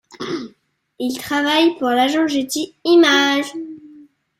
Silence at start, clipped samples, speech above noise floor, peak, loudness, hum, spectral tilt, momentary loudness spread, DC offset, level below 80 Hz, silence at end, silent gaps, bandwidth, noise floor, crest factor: 0.15 s; under 0.1%; 41 dB; -2 dBFS; -17 LUFS; none; -2.5 dB/octave; 16 LU; under 0.1%; -64 dBFS; 0.4 s; none; 16 kHz; -57 dBFS; 16 dB